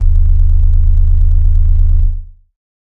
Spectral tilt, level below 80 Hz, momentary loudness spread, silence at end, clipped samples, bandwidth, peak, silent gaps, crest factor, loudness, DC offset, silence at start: -10 dB/octave; -8 dBFS; 4 LU; 0.7 s; under 0.1%; 0.6 kHz; 0 dBFS; none; 8 dB; -14 LUFS; under 0.1%; 0 s